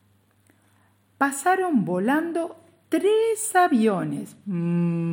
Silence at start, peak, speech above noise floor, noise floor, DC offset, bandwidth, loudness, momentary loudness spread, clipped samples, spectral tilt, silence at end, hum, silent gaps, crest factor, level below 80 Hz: 1.2 s; -8 dBFS; 39 dB; -61 dBFS; under 0.1%; 17 kHz; -23 LUFS; 10 LU; under 0.1%; -5.5 dB/octave; 0 s; none; none; 16 dB; -76 dBFS